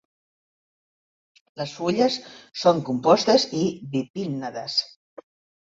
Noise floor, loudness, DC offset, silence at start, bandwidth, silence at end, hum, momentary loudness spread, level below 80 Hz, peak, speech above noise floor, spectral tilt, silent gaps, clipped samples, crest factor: under -90 dBFS; -23 LUFS; under 0.1%; 1.55 s; 7.8 kHz; 0.75 s; none; 14 LU; -66 dBFS; -4 dBFS; over 67 dB; -5 dB/octave; 4.10-4.14 s; under 0.1%; 20 dB